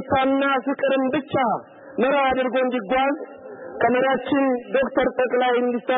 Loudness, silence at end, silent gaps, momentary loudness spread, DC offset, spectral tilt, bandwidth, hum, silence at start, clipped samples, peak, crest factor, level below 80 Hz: -21 LUFS; 0 s; none; 7 LU; under 0.1%; -10 dB/octave; 3.9 kHz; none; 0 s; under 0.1%; -8 dBFS; 12 dB; -56 dBFS